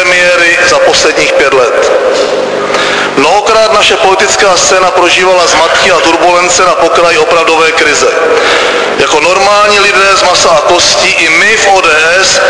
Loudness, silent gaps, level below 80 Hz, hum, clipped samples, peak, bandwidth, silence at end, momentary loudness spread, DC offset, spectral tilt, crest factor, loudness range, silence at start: -5 LUFS; none; -38 dBFS; none; 2%; 0 dBFS; 11 kHz; 0 s; 4 LU; under 0.1%; -1 dB/octave; 6 dB; 2 LU; 0 s